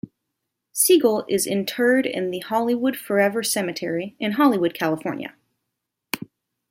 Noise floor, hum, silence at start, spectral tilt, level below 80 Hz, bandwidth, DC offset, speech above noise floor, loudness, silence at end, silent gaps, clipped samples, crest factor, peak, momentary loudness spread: -81 dBFS; none; 0.05 s; -3.5 dB/octave; -68 dBFS; 16.5 kHz; under 0.1%; 60 dB; -21 LUFS; 0.55 s; none; under 0.1%; 18 dB; -4 dBFS; 14 LU